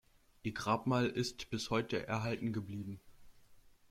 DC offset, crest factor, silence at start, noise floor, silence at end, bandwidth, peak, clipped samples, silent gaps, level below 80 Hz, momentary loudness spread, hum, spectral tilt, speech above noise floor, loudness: under 0.1%; 20 dB; 0.45 s; -62 dBFS; 0.2 s; 16 kHz; -18 dBFS; under 0.1%; none; -64 dBFS; 12 LU; none; -5.5 dB/octave; 25 dB; -37 LUFS